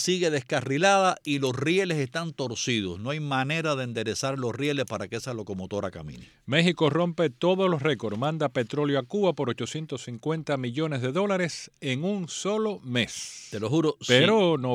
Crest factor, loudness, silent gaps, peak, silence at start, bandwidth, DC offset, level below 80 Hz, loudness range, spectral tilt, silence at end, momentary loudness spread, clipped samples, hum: 22 dB; -26 LUFS; none; -4 dBFS; 0 s; 14.5 kHz; under 0.1%; -64 dBFS; 4 LU; -5 dB/octave; 0 s; 11 LU; under 0.1%; none